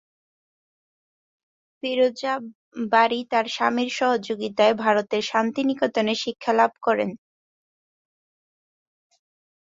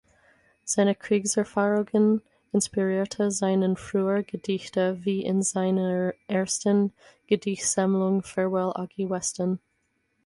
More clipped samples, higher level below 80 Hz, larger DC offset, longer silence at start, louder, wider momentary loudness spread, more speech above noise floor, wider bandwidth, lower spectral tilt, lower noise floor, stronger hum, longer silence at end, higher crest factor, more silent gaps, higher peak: neither; second, -72 dBFS vs -64 dBFS; neither; first, 1.85 s vs 0.65 s; first, -23 LUFS vs -26 LUFS; about the same, 8 LU vs 6 LU; first, over 68 dB vs 48 dB; second, 7.8 kHz vs 11.5 kHz; about the same, -4 dB/octave vs -5 dB/octave; first, under -90 dBFS vs -73 dBFS; neither; first, 2.55 s vs 0.7 s; first, 22 dB vs 16 dB; first, 2.55-2.72 s vs none; first, -4 dBFS vs -10 dBFS